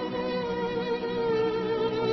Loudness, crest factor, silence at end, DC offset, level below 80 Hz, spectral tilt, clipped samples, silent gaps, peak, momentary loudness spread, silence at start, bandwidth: -28 LUFS; 12 dB; 0 s; under 0.1%; -56 dBFS; -7 dB/octave; under 0.1%; none; -16 dBFS; 3 LU; 0 s; 6.2 kHz